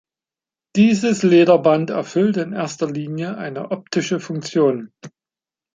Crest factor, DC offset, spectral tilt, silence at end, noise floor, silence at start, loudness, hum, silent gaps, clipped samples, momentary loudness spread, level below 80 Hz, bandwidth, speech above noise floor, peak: 18 dB; under 0.1%; -6 dB/octave; 0.7 s; under -90 dBFS; 0.75 s; -18 LUFS; none; none; under 0.1%; 13 LU; -64 dBFS; 9.4 kHz; over 72 dB; -2 dBFS